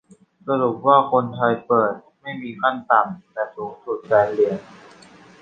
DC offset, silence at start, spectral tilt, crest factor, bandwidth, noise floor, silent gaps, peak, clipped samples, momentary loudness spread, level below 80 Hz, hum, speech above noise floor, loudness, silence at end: under 0.1%; 0.45 s; -7.5 dB/octave; 20 dB; 9 kHz; -47 dBFS; none; -2 dBFS; under 0.1%; 16 LU; -64 dBFS; none; 27 dB; -20 LUFS; 0.65 s